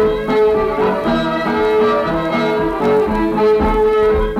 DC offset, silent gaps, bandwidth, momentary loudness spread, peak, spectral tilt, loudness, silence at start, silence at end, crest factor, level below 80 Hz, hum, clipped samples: under 0.1%; none; 8.6 kHz; 3 LU; -4 dBFS; -7 dB/octave; -15 LUFS; 0 s; 0 s; 10 dB; -30 dBFS; none; under 0.1%